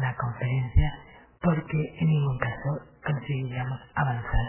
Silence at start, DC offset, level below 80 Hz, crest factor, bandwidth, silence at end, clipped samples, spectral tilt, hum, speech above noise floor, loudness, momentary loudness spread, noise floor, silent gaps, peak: 0 s; under 0.1%; -34 dBFS; 18 dB; 3.2 kHz; 0 s; under 0.1%; -11.5 dB/octave; none; 22 dB; -28 LUFS; 7 LU; -48 dBFS; none; -8 dBFS